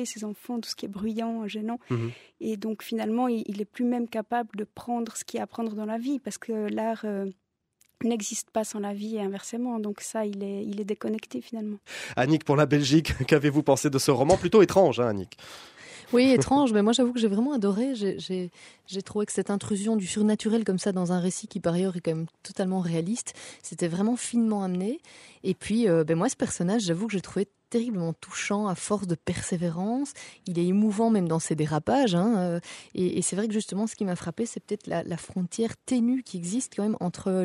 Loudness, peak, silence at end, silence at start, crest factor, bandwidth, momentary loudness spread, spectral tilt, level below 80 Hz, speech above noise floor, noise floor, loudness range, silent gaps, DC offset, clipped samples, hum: -27 LUFS; -6 dBFS; 0 s; 0 s; 22 dB; 15.5 kHz; 12 LU; -5.5 dB/octave; -56 dBFS; 42 dB; -68 dBFS; 8 LU; none; under 0.1%; under 0.1%; none